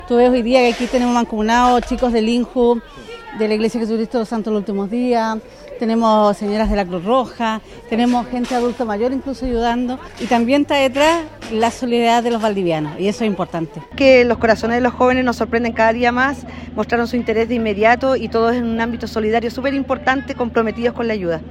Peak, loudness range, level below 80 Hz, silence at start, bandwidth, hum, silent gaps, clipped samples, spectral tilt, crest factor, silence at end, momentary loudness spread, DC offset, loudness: 0 dBFS; 4 LU; -38 dBFS; 0 s; 12.5 kHz; none; none; under 0.1%; -5.5 dB/octave; 16 dB; 0 s; 8 LU; under 0.1%; -17 LUFS